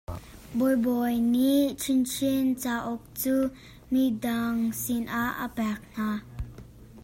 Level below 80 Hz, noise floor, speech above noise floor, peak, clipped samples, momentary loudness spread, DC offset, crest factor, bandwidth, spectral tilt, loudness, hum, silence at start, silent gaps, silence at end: -50 dBFS; -47 dBFS; 21 dB; -14 dBFS; under 0.1%; 11 LU; under 0.1%; 14 dB; 16.5 kHz; -4.5 dB/octave; -27 LUFS; none; 0.1 s; none; 0 s